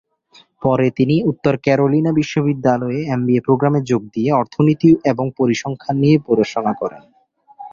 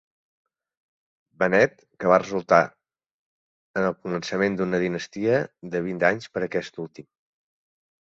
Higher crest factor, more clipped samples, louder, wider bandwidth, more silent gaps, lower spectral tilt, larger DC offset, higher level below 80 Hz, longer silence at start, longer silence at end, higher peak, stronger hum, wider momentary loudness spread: second, 16 dB vs 22 dB; neither; first, -17 LUFS vs -24 LUFS; about the same, 7.4 kHz vs 7.8 kHz; second, none vs 3.11-3.74 s; first, -7.5 dB/octave vs -6 dB/octave; neither; first, -54 dBFS vs -62 dBFS; second, 0.6 s vs 1.4 s; second, 0.05 s vs 1 s; about the same, -2 dBFS vs -4 dBFS; neither; second, 7 LU vs 10 LU